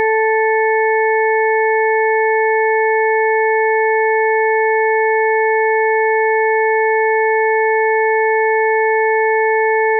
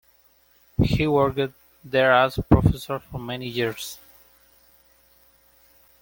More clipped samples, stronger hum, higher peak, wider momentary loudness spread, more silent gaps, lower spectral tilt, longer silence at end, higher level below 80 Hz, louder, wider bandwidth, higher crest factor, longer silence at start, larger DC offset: neither; neither; second, -8 dBFS vs -2 dBFS; second, 0 LU vs 14 LU; neither; second, -2 dB/octave vs -6.5 dB/octave; second, 0 s vs 2.05 s; second, under -90 dBFS vs -38 dBFS; first, -14 LUFS vs -23 LUFS; second, 2.4 kHz vs 17 kHz; second, 6 dB vs 22 dB; second, 0 s vs 0.8 s; neither